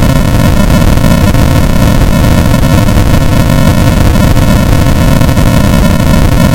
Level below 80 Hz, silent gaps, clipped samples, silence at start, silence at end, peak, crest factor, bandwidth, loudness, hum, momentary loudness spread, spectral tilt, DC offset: -10 dBFS; none; 2%; 0 s; 0 s; 0 dBFS; 6 dB; 17 kHz; -7 LUFS; none; 1 LU; -6 dB/octave; under 0.1%